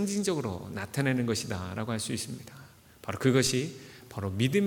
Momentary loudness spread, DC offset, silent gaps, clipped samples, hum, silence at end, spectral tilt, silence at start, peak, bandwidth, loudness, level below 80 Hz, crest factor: 17 LU; under 0.1%; none; under 0.1%; none; 0 s; -5 dB/octave; 0 s; -10 dBFS; 19 kHz; -30 LUFS; -62 dBFS; 20 dB